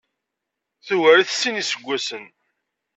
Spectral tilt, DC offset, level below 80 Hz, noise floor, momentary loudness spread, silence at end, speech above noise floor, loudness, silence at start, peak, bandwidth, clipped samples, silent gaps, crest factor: -2 dB/octave; under 0.1%; -76 dBFS; -82 dBFS; 13 LU; 0.7 s; 62 dB; -19 LUFS; 0.85 s; -2 dBFS; 8.2 kHz; under 0.1%; none; 20 dB